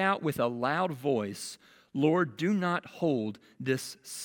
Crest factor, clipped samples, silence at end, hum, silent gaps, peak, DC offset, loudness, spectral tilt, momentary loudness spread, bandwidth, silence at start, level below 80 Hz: 18 dB; under 0.1%; 0 s; none; none; -12 dBFS; under 0.1%; -31 LUFS; -5.5 dB/octave; 12 LU; 18 kHz; 0 s; -74 dBFS